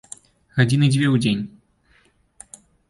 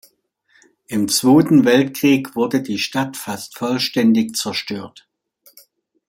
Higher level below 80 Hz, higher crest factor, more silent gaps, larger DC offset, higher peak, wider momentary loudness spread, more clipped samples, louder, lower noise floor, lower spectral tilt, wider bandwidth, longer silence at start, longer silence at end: first, -54 dBFS vs -62 dBFS; about the same, 18 dB vs 16 dB; neither; neither; about the same, -4 dBFS vs -2 dBFS; first, 25 LU vs 15 LU; neither; about the same, -19 LUFS vs -17 LUFS; about the same, -59 dBFS vs -60 dBFS; first, -6 dB/octave vs -4.5 dB/octave; second, 11.5 kHz vs 16.5 kHz; second, 0.55 s vs 0.9 s; first, 1.45 s vs 1.2 s